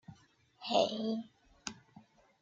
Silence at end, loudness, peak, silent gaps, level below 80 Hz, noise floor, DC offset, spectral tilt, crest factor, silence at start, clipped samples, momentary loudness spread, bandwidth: 0.4 s; -36 LUFS; -16 dBFS; none; -76 dBFS; -65 dBFS; under 0.1%; -4 dB/octave; 24 dB; 0.1 s; under 0.1%; 25 LU; 9.2 kHz